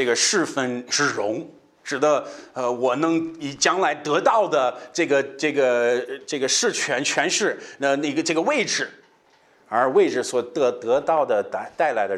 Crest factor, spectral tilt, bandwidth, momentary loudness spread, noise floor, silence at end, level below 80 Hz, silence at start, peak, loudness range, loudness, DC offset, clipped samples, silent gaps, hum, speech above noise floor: 18 dB; -2.5 dB/octave; 13.5 kHz; 8 LU; -58 dBFS; 0 s; -72 dBFS; 0 s; -4 dBFS; 2 LU; -22 LUFS; under 0.1%; under 0.1%; none; none; 36 dB